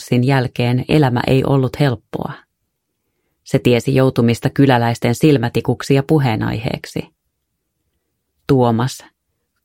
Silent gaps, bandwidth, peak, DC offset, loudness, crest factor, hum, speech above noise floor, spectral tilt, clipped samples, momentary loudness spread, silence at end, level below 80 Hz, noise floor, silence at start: none; 16 kHz; 0 dBFS; under 0.1%; -16 LUFS; 16 dB; none; 57 dB; -7 dB/octave; under 0.1%; 12 LU; 0.65 s; -44 dBFS; -72 dBFS; 0 s